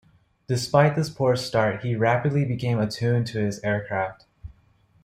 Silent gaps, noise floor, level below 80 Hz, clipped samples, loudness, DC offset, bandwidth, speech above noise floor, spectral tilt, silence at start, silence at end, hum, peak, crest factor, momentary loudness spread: none; -60 dBFS; -56 dBFS; under 0.1%; -24 LUFS; under 0.1%; 15 kHz; 37 dB; -6.5 dB/octave; 0.5 s; 0.55 s; none; -4 dBFS; 20 dB; 8 LU